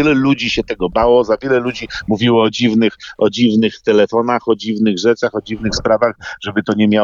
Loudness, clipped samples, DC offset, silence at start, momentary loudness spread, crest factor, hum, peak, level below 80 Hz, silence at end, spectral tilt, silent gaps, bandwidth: -15 LUFS; under 0.1%; under 0.1%; 0 s; 7 LU; 14 dB; none; -2 dBFS; -40 dBFS; 0 s; -5.5 dB/octave; none; 7.4 kHz